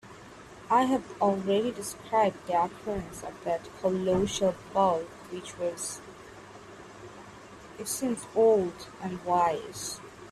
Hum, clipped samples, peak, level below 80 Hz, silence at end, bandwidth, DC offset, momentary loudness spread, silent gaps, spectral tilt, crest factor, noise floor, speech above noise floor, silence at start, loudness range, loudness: none; under 0.1%; -12 dBFS; -58 dBFS; 0 s; 15 kHz; under 0.1%; 22 LU; none; -4.5 dB/octave; 18 dB; -48 dBFS; 20 dB; 0.05 s; 5 LU; -29 LUFS